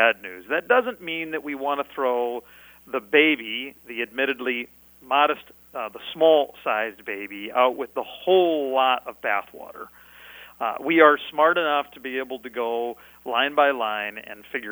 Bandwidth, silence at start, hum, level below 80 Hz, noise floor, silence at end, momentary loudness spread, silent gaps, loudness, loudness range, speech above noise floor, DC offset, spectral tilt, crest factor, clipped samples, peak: over 20 kHz; 0 s; 60 Hz at -65 dBFS; -66 dBFS; -45 dBFS; 0 s; 15 LU; none; -23 LUFS; 3 LU; 22 dB; under 0.1%; -5 dB/octave; 22 dB; under 0.1%; -2 dBFS